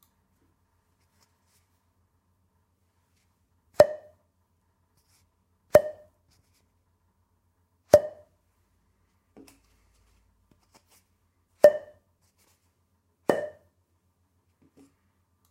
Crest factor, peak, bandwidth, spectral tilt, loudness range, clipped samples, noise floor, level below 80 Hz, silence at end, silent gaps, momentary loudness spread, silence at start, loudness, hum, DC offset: 30 dB; 0 dBFS; 16 kHz; -5 dB/octave; 3 LU; under 0.1%; -72 dBFS; -64 dBFS; 2 s; none; 21 LU; 3.8 s; -23 LUFS; none; under 0.1%